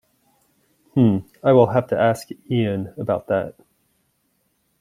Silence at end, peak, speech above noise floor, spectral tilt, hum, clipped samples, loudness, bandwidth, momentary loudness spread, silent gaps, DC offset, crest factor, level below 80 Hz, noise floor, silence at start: 1.3 s; -2 dBFS; 49 dB; -8 dB/octave; none; under 0.1%; -20 LUFS; 15 kHz; 10 LU; none; under 0.1%; 18 dB; -60 dBFS; -68 dBFS; 0.95 s